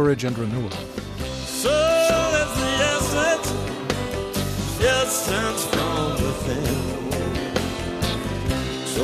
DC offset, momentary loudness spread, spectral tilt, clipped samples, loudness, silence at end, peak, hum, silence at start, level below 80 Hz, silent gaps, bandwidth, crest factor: under 0.1%; 9 LU; -4 dB/octave; under 0.1%; -23 LUFS; 0 s; -8 dBFS; none; 0 s; -36 dBFS; none; 14 kHz; 14 dB